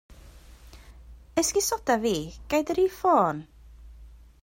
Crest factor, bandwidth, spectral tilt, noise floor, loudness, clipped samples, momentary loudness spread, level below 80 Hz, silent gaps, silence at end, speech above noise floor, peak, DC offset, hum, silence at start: 20 dB; 16 kHz; -3.5 dB/octave; -49 dBFS; -25 LUFS; under 0.1%; 8 LU; -50 dBFS; none; 0.35 s; 24 dB; -8 dBFS; under 0.1%; none; 0.1 s